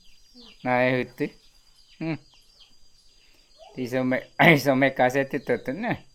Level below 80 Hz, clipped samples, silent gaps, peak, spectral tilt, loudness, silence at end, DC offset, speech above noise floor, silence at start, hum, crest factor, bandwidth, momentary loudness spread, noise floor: -58 dBFS; under 0.1%; none; -2 dBFS; -6 dB/octave; -24 LUFS; 0.15 s; under 0.1%; 32 dB; 0.4 s; none; 24 dB; 17 kHz; 16 LU; -56 dBFS